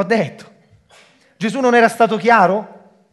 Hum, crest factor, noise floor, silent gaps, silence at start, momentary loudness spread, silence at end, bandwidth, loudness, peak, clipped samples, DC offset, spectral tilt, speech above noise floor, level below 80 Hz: none; 16 dB; -50 dBFS; none; 0 s; 11 LU; 0.45 s; 12.5 kHz; -15 LUFS; 0 dBFS; under 0.1%; under 0.1%; -5.5 dB/octave; 35 dB; -68 dBFS